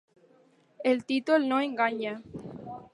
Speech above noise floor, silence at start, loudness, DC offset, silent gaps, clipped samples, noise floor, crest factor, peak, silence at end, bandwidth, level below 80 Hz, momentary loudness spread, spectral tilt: 35 dB; 0.8 s; -28 LUFS; under 0.1%; none; under 0.1%; -63 dBFS; 18 dB; -12 dBFS; 0.1 s; 11.5 kHz; -70 dBFS; 17 LU; -5.5 dB/octave